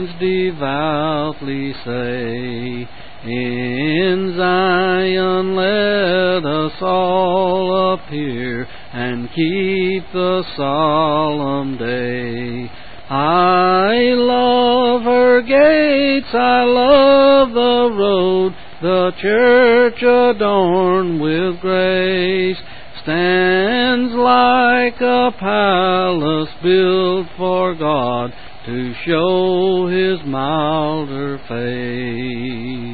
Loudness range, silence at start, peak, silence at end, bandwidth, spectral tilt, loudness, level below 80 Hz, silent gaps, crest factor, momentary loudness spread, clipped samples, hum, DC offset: 7 LU; 0 s; 0 dBFS; 0 s; 4.8 kHz; -11 dB/octave; -15 LUFS; -46 dBFS; none; 14 dB; 12 LU; under 0.1%; none; 2%